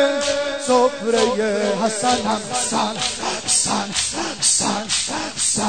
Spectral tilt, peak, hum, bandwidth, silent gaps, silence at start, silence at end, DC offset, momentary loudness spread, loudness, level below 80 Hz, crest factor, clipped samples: -2 dB/octave; -4 dBFS; none; 9.6 kHz; none; 0 s; 0 s; 0.5%; 5 LU; -19 LUFS; -50 dBFS; 16 dB; under 0.1%